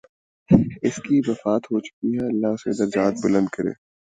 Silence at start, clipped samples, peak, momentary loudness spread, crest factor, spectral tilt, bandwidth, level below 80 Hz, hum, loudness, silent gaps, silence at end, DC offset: 0.5 s; under 0.1%; 0 dBFS; 8 LU; 22 dB; -7.5 dB/octave; 9.2 kHz; -48 dBFS; none; -22 LUFS; 1.93-2.02 s; 0.4 s; under 0.1%